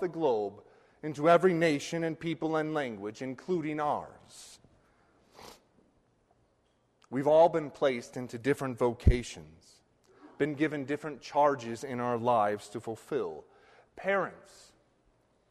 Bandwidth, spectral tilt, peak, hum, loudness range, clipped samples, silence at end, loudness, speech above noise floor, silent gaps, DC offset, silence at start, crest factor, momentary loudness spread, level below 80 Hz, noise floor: 13 kHz; -6.5 dB/octave; -10 dBFS; none; 8 LU; under 0.1%; 1.15 s; -30 LUFS; 41 dB; none; under 0.1%; 0 s; 22 dB; 16 LU; -44 dBFS; -71 dBFS